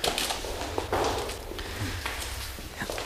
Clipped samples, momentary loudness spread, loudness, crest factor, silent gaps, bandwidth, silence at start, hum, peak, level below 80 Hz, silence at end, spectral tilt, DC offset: under 0.1%; 8 LU; -32 LUFS; 22 dB; none; 15.5 kHz; 0 s; none; -8 dBFS; -42 dBFS; 0 s; -3 dB/octave; under 0.1%